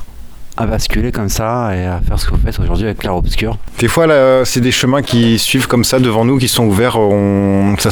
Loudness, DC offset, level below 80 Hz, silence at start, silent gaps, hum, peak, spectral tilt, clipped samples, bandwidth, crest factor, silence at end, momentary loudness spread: -13 LUFS; under 0.1%; -22 dBFS; 0 s; none; none; 0 dBFS; -5 dB/octave; under 0.1%; over 20 kHz; 12 dB; 0 s; 8 LU